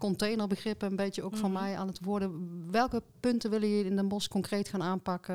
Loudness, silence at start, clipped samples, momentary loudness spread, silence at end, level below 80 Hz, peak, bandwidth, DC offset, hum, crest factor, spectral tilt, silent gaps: -33 LUFS; 0 s; under 0.1%; 5 LU; 0 s; -60 dBFS; -16 dBFS; 16 kHz; 0.1%; none; 16 dB; -6 dB/octave; none